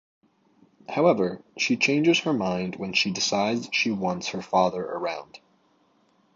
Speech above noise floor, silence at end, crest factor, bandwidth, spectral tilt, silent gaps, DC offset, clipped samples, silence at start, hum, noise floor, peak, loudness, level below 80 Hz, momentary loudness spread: 40 dB; 1 s; 20 dB; 7.6 kHz; -4 dB/octave; none; under 0.1%; under 0.1%; 0.9 s; none; -64 dBFS; -6 dBFS; -24 LUFS; -64 dBFS; 9 LU